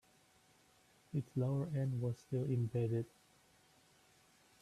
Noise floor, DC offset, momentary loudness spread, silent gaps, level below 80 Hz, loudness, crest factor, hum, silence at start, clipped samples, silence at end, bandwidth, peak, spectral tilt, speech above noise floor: -70 dBFS; under 0.1%; 6 LU; none; -74 dBFS; -39 LUFS; 14 dB; none; 1.15 s; under 0.1%; 1.55 s; 12.5 kHz; -26 dBFS; -9 dB/octave; 32 dB